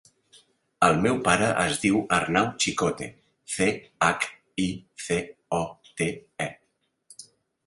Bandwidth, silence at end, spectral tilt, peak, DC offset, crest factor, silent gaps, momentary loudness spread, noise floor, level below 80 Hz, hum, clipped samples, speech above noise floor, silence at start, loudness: 11.5 kHz; 0.45 s; -4 dB/octave; -2 dBFS; under 0.1%; 24 dB; none; 13 LU; -73 dBFS; -54 dBFS; none; under 0.1%; 48 dB; 0.8 s; -25 LUFS